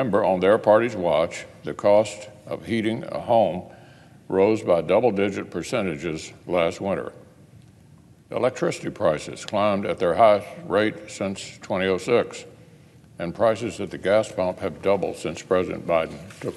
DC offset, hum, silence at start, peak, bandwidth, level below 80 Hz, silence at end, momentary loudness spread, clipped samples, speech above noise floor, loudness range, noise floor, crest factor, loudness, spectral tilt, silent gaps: under 0.1%; none; 0 s; -4 dBFS; 12.5 kHz; -58 dBFS; 0 s; 13 LU; under 0.1%; 28 dB; 5 LU; -51 dBFS; 20 dB; -23 LUFS; -5.5 dB/octave; none